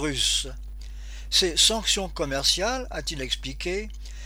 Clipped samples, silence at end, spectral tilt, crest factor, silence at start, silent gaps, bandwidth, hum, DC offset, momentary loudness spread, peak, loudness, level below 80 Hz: under 0.1%; 0 s; -1.5 dB/octave; 20 dB; 0 s; none; over 20 kHz; none; under 0.1%; 21 LU; -6 dBFS; -24 LUFS; -36 dBFS